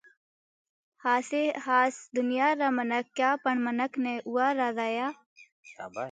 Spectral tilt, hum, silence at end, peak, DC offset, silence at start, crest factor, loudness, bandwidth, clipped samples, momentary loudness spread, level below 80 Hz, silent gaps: -3.5 dB/octave; none; 0 s; -12 dBFS; under 0.1%; 1.05 s; 18 dB; -28 LUFS; 9.2 kHz; under 0.1%; 8 LU; -82 dBFS; 5.26-5.36 s, 5.52-5.63 s